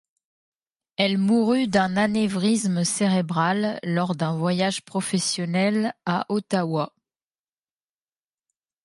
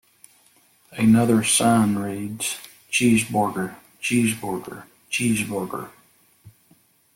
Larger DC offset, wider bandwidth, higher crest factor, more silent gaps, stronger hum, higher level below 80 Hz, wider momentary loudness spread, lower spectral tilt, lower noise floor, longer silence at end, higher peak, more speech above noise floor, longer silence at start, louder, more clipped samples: neither; second, 11.5 kHz vs 17 kHz; about the same, 20 dB vs 16 dB; neither; neither; second, -64 dBFS vs -58 dBFS; second, 5 LU vs 17 LU; about the same, -5 dB/octave vs -4.5 dB/octave; first, under -90 dBFS vs -59 dBFS; first, 1.95 s vs 0.65 s; about the same, -4 dBFS vs -6 dBFS; first, over 67 dB vs 38 dB; about the same, 1 s vs 0.9 s; about the same, -23 LUFS vs -21 LUFS; neither